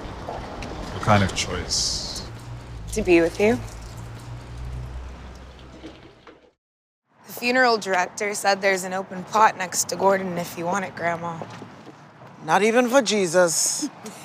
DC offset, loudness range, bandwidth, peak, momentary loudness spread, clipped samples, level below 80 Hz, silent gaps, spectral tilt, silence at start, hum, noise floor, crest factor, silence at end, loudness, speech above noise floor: under 0.1%; 9 LU; 16.5 kHz; -4 dBFS; 20 LU; under 0.1%; -42 dBFS; 6.58-7.02 s; -3.5 dB/octave; 0 s; none; -50 dBFS; 22 dB; 0 s; -22 LUFS; 28 dB